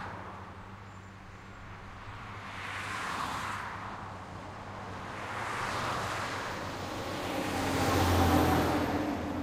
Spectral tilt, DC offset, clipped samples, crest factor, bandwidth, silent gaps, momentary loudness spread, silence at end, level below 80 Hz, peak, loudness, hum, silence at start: -5 dB/octave; under 0.1%; under 0.1%; 22 dB; 16 kHz; none; 20 LU; 0 s; -54 dBFS; -12 dBFS; -33 LUFS; none; 0 s